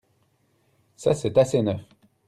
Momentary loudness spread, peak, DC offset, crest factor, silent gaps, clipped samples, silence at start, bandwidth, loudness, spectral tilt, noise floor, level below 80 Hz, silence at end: 8 LU; -8 dBFS; under 0.1%; 18 dB; none; under 0.1%; 1 s; 13 kHz; -23 LUFS; -6.5 dB/octave; -67 dBFS; -60 dBFS; 0.45 s